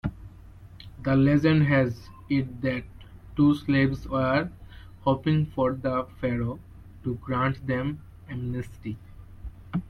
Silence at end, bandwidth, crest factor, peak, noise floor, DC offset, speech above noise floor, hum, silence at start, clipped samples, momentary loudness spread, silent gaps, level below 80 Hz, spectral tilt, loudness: 0 s; 6.6 kHz; 18 dB; -8 dBFS; -47 dBFS; under 0.1%; 22 dB; none; 0.05 s; under 0.1%; 20 LU; none; -46 dBFS; -8.5 dB/octave; -26 LUFS